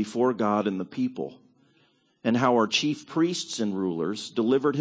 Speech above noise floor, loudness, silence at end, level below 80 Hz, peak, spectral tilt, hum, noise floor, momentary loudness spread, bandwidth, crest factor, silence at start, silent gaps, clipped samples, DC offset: 40 dB; -26 LUFS; 0 s; -70 dBFS; -8 dBFS; -5 dB/octave; none; -65 dBFS; 8 LU; 8 kHz; 18 dB; 0 s; none; under 0.1%; under 0.1%